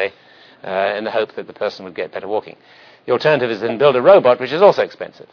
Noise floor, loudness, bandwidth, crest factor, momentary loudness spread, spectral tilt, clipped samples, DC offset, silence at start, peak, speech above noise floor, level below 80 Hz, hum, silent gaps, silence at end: -47 dBFS; -16 LUFS; 5.4 kHz; 16 dB; 16 LU; -6.5 dB/octave; under 0.1%; under 0.1%; 0 s; 0 dBFS; 30 dB; -62 dBFS; none; none; 0.1 s